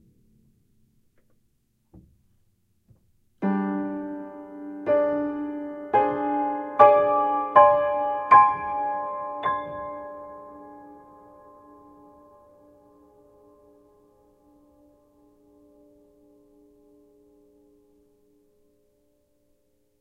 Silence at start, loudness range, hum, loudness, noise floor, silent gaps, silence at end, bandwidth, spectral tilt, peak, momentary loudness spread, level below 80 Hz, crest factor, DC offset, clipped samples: 3.4 s; 16 LU; none; -22 LUFS; -69 dBFS; none; 9.05 s; 5 kHz; -8.5 dB/octave; -2 dBFS; 24 LU; -64 dBFS; 26 dB; under 0.1%; under 0.1%